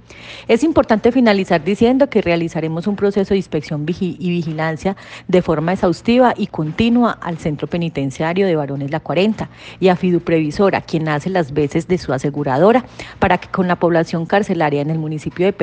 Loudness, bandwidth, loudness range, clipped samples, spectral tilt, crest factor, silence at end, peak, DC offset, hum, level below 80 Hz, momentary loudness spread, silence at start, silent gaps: -17 LUFS; 9.2 kHz; 3 LU; under 0.1%; -7 dB/octave; 16 dB; 0 s; 0 dBFS; under 0.1%; none; -46 dBFS; 8 LU; 0.1 s; none